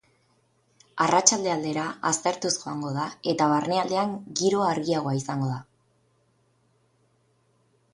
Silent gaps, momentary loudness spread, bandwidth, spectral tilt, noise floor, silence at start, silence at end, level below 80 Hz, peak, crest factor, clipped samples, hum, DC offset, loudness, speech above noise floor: none; 10 LU; 11.5 kHz; -3.5 dB/octave; -67 dBFS; 0.95 s; 2.3 s; -68 dBFS; -2 dBFS; 26 dB; under 0.1%; none; under 0.1%; -25 LUFS; 42 dB